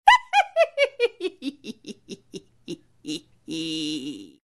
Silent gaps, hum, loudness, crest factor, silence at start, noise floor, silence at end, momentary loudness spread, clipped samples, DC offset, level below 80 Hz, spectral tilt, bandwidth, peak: none; none; -24 LUFS; 24 dB; 0.05 s; -44 dBFS; 0.2 s; 20 LU; under 0.1%; under 0.1%; -62 dBFS; -3 dB/octave; 12 kHz; 0 dBFS